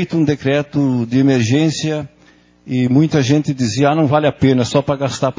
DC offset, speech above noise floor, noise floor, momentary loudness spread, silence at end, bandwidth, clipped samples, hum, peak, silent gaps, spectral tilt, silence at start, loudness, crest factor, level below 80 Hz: under 0.1%; 35 dB; -49 dBFS; 6 LU; 0.05 s; 7.6 kHz; under 0.1%; none; 0 dBFS; none; -6.5 dB/octave; 0 s; -15 LUFS; 16 dB; -46 dBFS